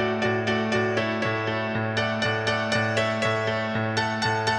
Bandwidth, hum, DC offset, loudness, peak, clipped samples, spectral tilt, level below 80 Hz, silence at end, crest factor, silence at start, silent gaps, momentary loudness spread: 10.5 kHz; none; under 0.1%; -25 LUFS; -10 dBFS; under 0.1%; -5 dB/octave; -56 dBFS; 0 s; 14 dB; 0 s; none; 2 LU